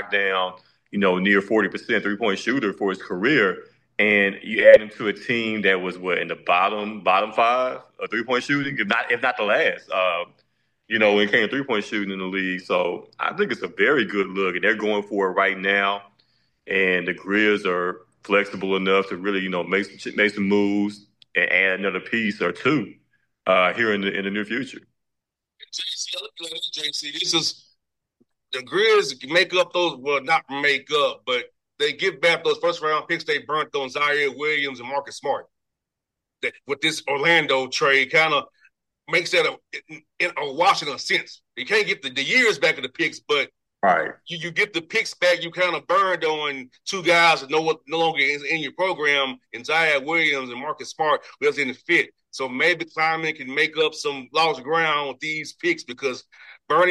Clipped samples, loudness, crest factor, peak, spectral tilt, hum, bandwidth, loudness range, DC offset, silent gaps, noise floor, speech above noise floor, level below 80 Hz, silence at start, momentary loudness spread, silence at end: under 0.1%; -21 LUFS; 22 dB; 0 dBFS; -3.5 dB/octave; none; 12.5 kHz; 4 LU; under 0.1%; none; -84 dBFS; 62 dB; -70 dBFS; 0 s; 10 LU; 0 s